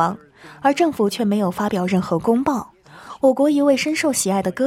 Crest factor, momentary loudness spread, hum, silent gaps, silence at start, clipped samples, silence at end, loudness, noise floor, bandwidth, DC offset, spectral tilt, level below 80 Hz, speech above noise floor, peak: 16 dB; 6 LU; none; none; 0 s; under 0.1%; 0 s; -19 LUFS; -40 dBFS; 16 kHz; under 0.1%; -5 dB/octave; -56 dBFS; 22 dB; -4 dBFS